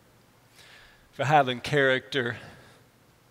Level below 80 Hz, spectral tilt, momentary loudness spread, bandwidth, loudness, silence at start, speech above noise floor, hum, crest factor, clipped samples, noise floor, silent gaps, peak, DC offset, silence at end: -66 dBFS; -5 dB/octave; 10 LU; 16 kHz; -25 LUFS; 1.2 s; 35 dB; none; 20 dB; under 0.1%; -59 dBFS; none; -8 dBFS; under 0.1%; 0.8 s